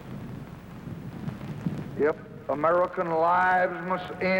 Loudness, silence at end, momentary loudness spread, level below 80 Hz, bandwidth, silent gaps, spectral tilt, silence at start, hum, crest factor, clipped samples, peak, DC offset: -27 LUFS; 0 s; 18 LU; -56 dBFS; 16.5 kHz; none; -7.5 dB/octave; 0 s; none; 16 dB; under 0.1%; -12 dBFS; under 0.1%